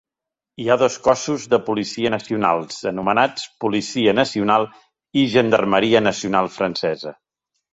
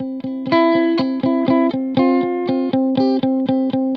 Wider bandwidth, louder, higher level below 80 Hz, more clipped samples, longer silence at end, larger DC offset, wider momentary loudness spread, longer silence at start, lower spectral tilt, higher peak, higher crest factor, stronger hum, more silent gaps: first, 8.2 kHz vs 5.2 kHz; about the same, -19 LUFS vs -17 LUFS; first, -56 dBFS vs -64 dBFS; neither; first, 0.6 s vs 0 s; neither; first, 8 LU vs 4 LU; first, 0.6 s vs 0 s; second, -4.5 dB/octave vs -8.5 dB/octave; about the same, 0 dBFS vs -2 dBFS; first, 20 dB vs 14 dB; neither; neither